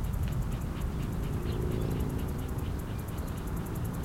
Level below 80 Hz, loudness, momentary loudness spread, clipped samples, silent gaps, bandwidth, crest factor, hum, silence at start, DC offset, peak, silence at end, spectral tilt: -38 dBFS; -35 LUFS; 4 LU; under 0.1%; none; 16.5 kHz; 14 dB; none; 0 s; under 0.1%; -18 dBFS; 0 s; -7 dB/octave